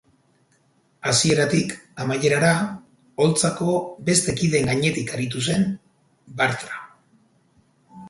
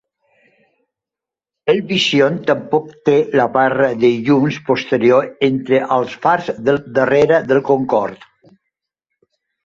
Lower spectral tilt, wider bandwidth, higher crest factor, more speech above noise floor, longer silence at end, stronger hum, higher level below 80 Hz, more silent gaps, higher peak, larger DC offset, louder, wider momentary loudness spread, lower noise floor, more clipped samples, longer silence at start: second, -4 dB/octave vs -6 dB/octave; first, 12 kHz vs 7.8 kHz; about the same, 20 dB vs 16 dB; second, 41 dB vs 72 dB; second, 0 s vs 1.5 s; neither; about the same, -54 dBFS vs -56 dBFS; neither; second, -4 dBFS vs 0 dBFS; neither; second, -21 LUFS vs -15 LUFS; first, 13 LU vs 5 LU; second, -63 dBFS vs -87 dBFS; neither; second, 1.05 s vs 1.65 s